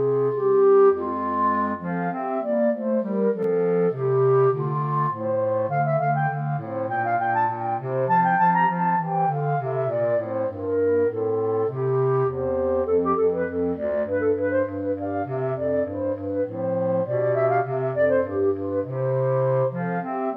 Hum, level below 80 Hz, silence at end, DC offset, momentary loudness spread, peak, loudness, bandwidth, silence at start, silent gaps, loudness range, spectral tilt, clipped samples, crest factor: none; -58 dBFS; 0 s; under 0.1%; 7 LU; -10 dBFS; -23 LUFS; 4.1 kHz; 0 s; none; 2 LU; -11 dB/octave; under 0.1%; 12 dB